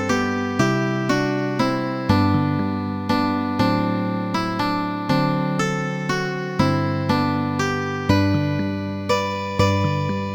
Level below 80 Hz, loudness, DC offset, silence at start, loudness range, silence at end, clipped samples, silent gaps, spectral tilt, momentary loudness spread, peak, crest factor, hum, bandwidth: -46 dBFS; -21 LUFS; under 0.1%; 0 s; 1 LU; 0 s; under 0.1%; none; -6.5 dB/octave; 4 LU; -4 dBFS; 18 dB; none; 19 kHz